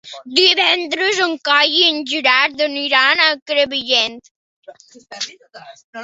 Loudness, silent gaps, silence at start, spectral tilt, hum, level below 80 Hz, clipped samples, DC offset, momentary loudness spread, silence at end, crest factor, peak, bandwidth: -14 LUFS; 3.42-3.46 s, 4.31-4.62 s, 5.84-5.93 s; 0.05 s; -0.5 dB/octave; none; -68 dBFS; under 0.1%; under 0.1%; 14 LU; 0 s; 18 dB; 0 dBFS; 8 kHz